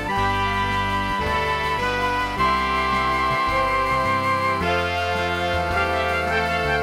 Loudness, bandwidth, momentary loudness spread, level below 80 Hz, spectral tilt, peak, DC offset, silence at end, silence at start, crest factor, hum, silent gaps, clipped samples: -21 LUFS; 16 kHz; 2 LU; -36 dBFS; -5 dB/octave; -8 dBFS; 0.2%; 0 s; 0 s; 14 dB; none; none; under 0.1%